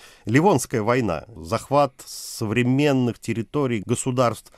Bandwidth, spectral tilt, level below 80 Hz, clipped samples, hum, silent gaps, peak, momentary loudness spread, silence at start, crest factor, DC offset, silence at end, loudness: 15.5 kHz; -6 dB/octave; -52 dBFS; under 0.1%; none; none; -4 dBFS; 9 LU; 0.05 s; 18 dB; under 0.1%; 0.2 s; -22 LUFS